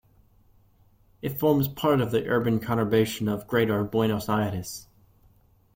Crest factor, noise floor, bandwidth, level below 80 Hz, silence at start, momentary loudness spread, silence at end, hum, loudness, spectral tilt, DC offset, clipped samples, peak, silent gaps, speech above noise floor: 18 dB; -60 dBFS; 16.5 kHz; -56 dBFS; 1.25 s; 11 LU; 0.9 s; none; -25 LUFS; -6.5 dB/octave; under 0.1%; under 0.1%; -10 dBFS; none; 35 dB